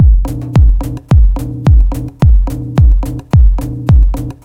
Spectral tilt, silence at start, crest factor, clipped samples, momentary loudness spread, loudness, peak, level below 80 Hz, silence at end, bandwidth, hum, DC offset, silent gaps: -8.5 dB/octave; 0 s; 8 dB; under 0.1%; 5 LU; -12 LUFS; 0 dBFS; -10 dBFS; 0.1 s; 7.2 kHz; none; under 0.1%; none